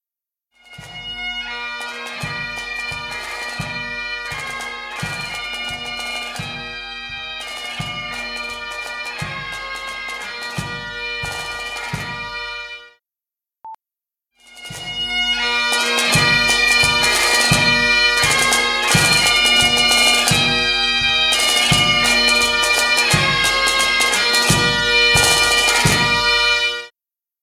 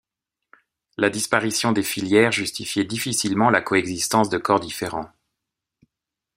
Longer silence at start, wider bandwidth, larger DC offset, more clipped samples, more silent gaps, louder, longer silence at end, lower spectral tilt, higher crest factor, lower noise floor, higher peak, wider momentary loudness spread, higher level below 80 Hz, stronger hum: second, 0.7 s vs 1 s; about the same, 16 kHz vs 16 kHz; neither; neither; neither; first, -15 LUFS vs -21 LUFS; second, 0.55 s vs 1.3 s; second, -1.5 dB/octave vs -3.5 dB/octave; about the same, 18 dB vs 22 dB; about the same, -87 dBFS vs -85 dBFS; about the same, -2 dBFS vs 0 dBFS; first, 15 LU vs 10 LU; first, -40 dBFS vs -60 dBFS; neither